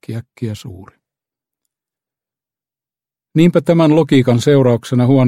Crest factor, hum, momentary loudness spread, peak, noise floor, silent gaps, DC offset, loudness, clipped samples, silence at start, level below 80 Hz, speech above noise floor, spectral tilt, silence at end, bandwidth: 16 dB; none; 14 LU; 0 dBFS; under -90 dBFS; none; under 0.1%; -12 LUFS; under 0.1%; 0.1 s; -52 dBFS; over 77 dB; -7.5 dB/octave; 0 s; 13.5 kHz